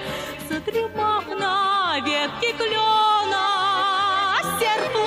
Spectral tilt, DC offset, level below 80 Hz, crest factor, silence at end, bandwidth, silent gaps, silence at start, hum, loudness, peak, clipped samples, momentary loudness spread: -2.5 dB/octave; under 0.1%; -56 dBFS; 10 dB; 0 s; 15.5 kHz; none; 0 s; none; -21 LUFS; -12 dBFS; under 0.1%; 7 LU